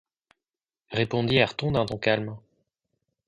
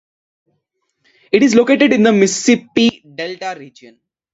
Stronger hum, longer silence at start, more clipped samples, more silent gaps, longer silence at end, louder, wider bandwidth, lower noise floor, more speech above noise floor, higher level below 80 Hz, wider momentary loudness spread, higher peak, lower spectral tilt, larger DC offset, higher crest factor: neither; second, 0.9 s vs 1.35 s; neither; neither; first, 0.9 s vs 0.65 s; second, -25 LUFS vs -13 LUFS; first, 10.5 kHz vs 8 kHz; first, under -90 dBFS vs -69 dBFS; first, over 65 dB vs 56 dB; first, -54 dBFS vs -60 dBFS; second, 12 LU vs 15 LU; second, -8 dBFS vs 0 dBFS; first, -6.5 dB/octave vs -4 dB/octave; neither; about the same, 20 dB vs 16 dB